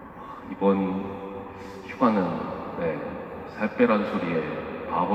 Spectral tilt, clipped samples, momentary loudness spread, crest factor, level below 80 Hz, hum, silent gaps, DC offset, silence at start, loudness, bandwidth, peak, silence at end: -8.5 dB/octave; under 0.1%; 16 LU; 20 dB; -58 dBFS; none; none; under 0.1%; 0 s; -27 LUFS; 8.2 kHz; -6 dBFS; 0 s